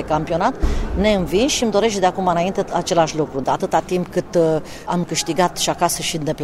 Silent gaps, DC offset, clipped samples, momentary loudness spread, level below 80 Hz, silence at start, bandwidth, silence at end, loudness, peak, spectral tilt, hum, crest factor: none; under 0.1%; under 0.1%; 5 LU; -30 dBFS; 0 s; 16 kHz; 0 s; -19 LUFS; -2 dBFS; -4.5 dB/octave; none; 18 dB